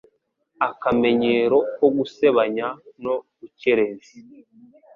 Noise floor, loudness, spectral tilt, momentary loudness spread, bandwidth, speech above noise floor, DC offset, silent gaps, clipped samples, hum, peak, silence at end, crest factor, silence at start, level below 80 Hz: -68 dBFS; -21 LUFS; -7 dB/octave; 10 LU; 7 kHz; 46 dB; under 0.1%; none; under 0.1%; none; -4 dBFS; 0.75 s; 18 dB; 0.6 s; -60 dBFS